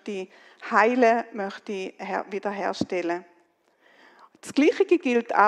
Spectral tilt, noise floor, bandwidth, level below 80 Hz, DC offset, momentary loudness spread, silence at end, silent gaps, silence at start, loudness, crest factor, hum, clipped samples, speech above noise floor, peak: -5 dB/octave; -64 dBFS; 12 kHz; -74 dBFS; under 0.1%; 14 LU; 0 s; none; 0.05 s; -25 LUFS; 20 dB; none; under 0.1%; 40 dB; -4 dBFS